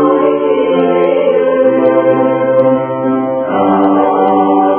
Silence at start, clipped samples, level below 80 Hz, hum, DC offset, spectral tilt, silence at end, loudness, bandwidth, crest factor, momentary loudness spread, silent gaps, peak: 0 s; under 0.1%; -56 dBFS; none; under 0.1%; -11 dB/octave; 0 s; -11 LUFS; 3.5 kHz; 10 dB; 4 LU; none; 0 dBFS